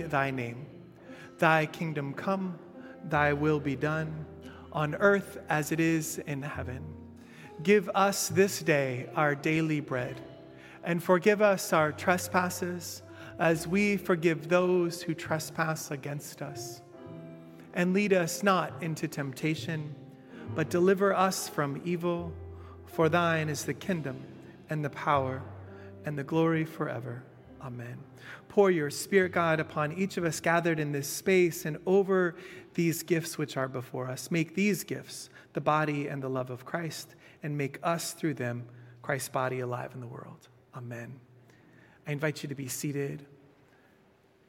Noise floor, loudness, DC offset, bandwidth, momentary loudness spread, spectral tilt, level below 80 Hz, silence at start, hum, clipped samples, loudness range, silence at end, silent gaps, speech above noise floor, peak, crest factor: -63 dBFS; -30 LUFS; under 0.1%; 16.5 kHz; 20 LU; -5.5 dB/octave; -68 dBFS; 0 s; none; under 0.1%; 7 LU; 1.25 s; none; 34 dB; -8 dBFS; 22 dB